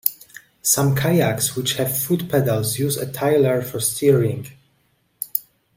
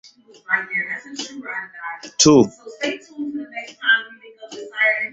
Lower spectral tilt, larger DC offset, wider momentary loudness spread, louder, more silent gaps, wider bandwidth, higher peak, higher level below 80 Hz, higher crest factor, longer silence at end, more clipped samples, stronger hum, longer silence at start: first, -4.5 dB/octave vs -3 dB/octave; neither; second, 8 LU vs 18 LU; about the same, -20 LUFS vs -20 LUFS; neither; first, 16.5 kHz vs 8.4 kHz; about the same, 0 dBFS vs -2 dBFS; about the same, -56 dBFS vs -58 dBFS; about the same, 20 dB vs 20 dB; first, 0.35 s vs 0 s; neither; neither; second, 0.05 s vs 0.5 s